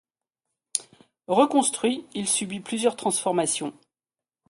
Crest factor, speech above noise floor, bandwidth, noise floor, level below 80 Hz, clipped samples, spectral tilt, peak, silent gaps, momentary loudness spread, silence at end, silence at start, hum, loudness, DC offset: 22 dB; over 66 dB; 12 kHz; under -90 dBFS; -72 dBFS; under 0.1%; -3 dB/octave; -4 dBFS; none; 10 LU; 0.8 s; 0.75 s; none; -25 LUFS; under 0.1%